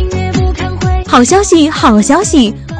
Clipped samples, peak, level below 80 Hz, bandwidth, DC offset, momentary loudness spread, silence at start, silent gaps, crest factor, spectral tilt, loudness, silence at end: 0.3%; 0 dBFS; -20 dBFS; 10.5 kHz; under 0.1%; 7 LU; 0 s; none; 10 dB; -5 dB/octave; -9 LUFS; 0 s